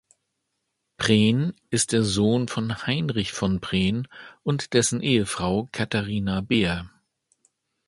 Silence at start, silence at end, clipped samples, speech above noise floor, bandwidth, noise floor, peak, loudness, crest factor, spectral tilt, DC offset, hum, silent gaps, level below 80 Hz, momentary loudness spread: 1 s; 1 s; under 0.1%; 55 dB; 11.5 kHz; -78 dBFS; -4 dBFS; -24 LUFS; 22 dB; -4.5 dB/octave; under 0.1%; none; none; -48 dBFS; 6 LU